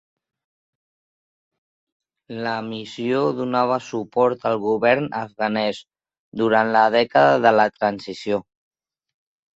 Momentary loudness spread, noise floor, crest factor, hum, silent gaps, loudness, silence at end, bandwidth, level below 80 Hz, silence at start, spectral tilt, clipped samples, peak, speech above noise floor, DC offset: 12 LU; under -90 dBFS; 20 dB; none; 6.19-6.32 s; -20 LUFS; 1.15 s; 8 kHz; -64 dBFS; 2.3 s; -6 dB/octave; under 0.1%; -2 dBFS; over 70 dB; under 0.1%